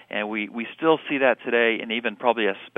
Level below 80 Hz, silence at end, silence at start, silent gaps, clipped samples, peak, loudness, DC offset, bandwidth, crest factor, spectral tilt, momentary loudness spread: -74 dBFS; 0.1 s; 0.1 s; none; under 0.1%; -4 dBFS; -23 LUFS; under 0.1%; 3.9 kHz; 20 dB; -7 dB/octave; 7 LU